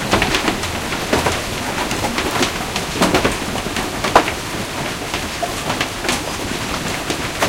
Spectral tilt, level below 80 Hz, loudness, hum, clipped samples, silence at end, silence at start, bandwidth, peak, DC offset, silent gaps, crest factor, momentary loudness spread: -3.5 dB/octave; -34 dBFS; -19 LUFS; none; under 0.1%; 0 s; 0 s; 17 kHz; 0 dBFS; under 0.1%; none; 20 dB; 7 LU